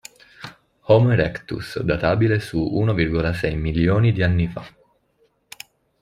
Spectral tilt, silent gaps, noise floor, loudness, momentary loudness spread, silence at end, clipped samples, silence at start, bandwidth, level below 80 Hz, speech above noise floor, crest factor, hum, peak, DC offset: -7.5 dB/octave; none; -64 dBFS; -20 LUFS; 22 LU; 1.3 s; under 0.1%; 0.4 s; 13 kHz; -40 dBFS; 45 dB; 18 dB; none; -4 dBFS; under 0.1%